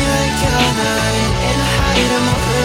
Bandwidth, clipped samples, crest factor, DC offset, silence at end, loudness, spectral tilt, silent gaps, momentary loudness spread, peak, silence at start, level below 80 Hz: 17 kHz; under 0.1%; 14 dB; under 0.1%; 0 s; -15 LUFS; -4 dB/octave; none; 2 LU; -2 dBFS; 0 s; -24 dBFS